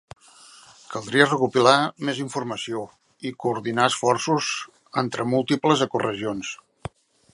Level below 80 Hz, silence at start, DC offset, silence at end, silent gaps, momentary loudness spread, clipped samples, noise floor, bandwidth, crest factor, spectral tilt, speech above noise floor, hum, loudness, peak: -62 dBFS; 0.9 s; under 0.1%; 0.8 s; none; 16 LU; under 0.1%; -50 dBFS; 11.5 kHz; 24 dB; -4 dB/octave; 27 dB; none; -23 LUFS; 0 dBFS